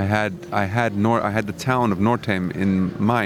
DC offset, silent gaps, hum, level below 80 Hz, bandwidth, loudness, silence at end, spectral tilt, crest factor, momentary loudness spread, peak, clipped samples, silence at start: under 0.1%; none; none; -56 dBFS; 15 kHz; -21 LUFS; 0 s; -7 dB/octave; 18 dB; 4 LU; -4 dBFS; under 0.1%; 0 s